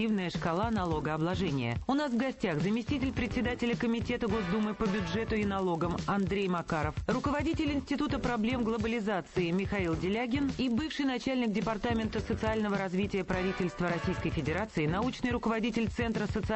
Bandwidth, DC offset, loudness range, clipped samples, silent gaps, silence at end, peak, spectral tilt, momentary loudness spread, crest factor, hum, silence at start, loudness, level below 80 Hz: 8.4 kHz; under 0.1%; 1 LU; under 0.1%; none; 0 s; -18 dBFS; -6.5 dB/octave; 2 LU; 14 dB; none; 0 s; -32 LUFS; -46 dBFS